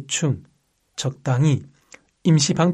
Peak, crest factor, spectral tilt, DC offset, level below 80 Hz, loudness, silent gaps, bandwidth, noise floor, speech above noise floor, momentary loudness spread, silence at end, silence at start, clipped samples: -4 dBFS; 18 dB; -5 dB/octave; under 0.1%; -60 dBFS; -21 LUFS; none; 11 kHz; -59 dBFS; 40 dB; 11 LU; 0 s; 0 s; under 0.1%